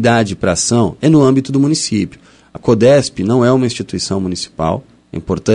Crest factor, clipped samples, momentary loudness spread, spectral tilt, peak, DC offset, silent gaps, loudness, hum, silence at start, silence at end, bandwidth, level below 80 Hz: 14 dB; under 0.1%; 11 LU; -5.5 dB/octave; 0 dBFS; under 0.1%; none; -14 LUFS; none; 0 s; 0 s; 11 kHz; -42 dBFS